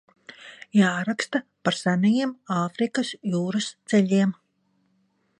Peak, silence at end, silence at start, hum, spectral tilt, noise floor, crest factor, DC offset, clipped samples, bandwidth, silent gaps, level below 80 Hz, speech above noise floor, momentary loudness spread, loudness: -6 dBFS; 1.05 s; 0.3 s; none; -5.5 dB/octave; -69 dBFS; 20 dB; under 0.1%; under 0.1%; 10.5 kHz; none; -72 dBFS; 46 dB; 8 LU; -24 LUFS